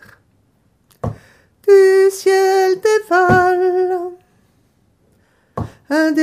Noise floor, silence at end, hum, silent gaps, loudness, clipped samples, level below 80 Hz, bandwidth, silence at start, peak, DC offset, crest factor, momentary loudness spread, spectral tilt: -58 dBFS; 0 s; none; none; -14 LUFS; under 0.1%; -46 dBFS; 14.5 kHz; 1.05 s; 0 dBFS; under 0.1%; 16 dB; 18 LU; -5.5 dB/octave